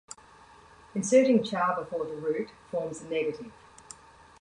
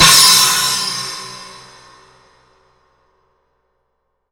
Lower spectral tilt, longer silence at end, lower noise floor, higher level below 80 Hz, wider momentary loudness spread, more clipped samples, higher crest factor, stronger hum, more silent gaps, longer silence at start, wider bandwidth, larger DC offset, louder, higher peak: first, -5 dB/octave vs 0.5 dB/octave; second, 0.9 s vs 2.85 s; second, -54 dBFS vs -69 dBFS; second, -66 dBFS vs -48 dBFS; about the same, 25 LU vs 24 LU; neither; about the same, 20 dB vs 18 dB; neither; neither; first, 0.95 s vs 0 s; second, 11 kHz vs over 20 kHz; neither; second, -28 LUFS vs -10 LUFS; second, -10 dBFS vs 0 dBFS